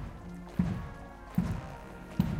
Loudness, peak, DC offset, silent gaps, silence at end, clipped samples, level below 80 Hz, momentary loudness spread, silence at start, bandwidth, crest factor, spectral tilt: -37 LUFS; -14 dBFS; under 0.1%; none; 0 s; under 0.1%; -46 dBFS; 12 LU; 0 s; 16 kHz; 22 dB; -8 dB/octave